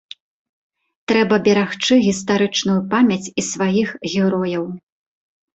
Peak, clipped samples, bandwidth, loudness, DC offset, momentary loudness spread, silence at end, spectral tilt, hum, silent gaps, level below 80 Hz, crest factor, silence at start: -2 dBFS; under 0.1%; 8.2 kHz; -18 LUFS; under 0.1%; 8 LU; 0.8 s; -4.5 dB/octave; none; none; -58 dBFS; 16 dB; 1.1 s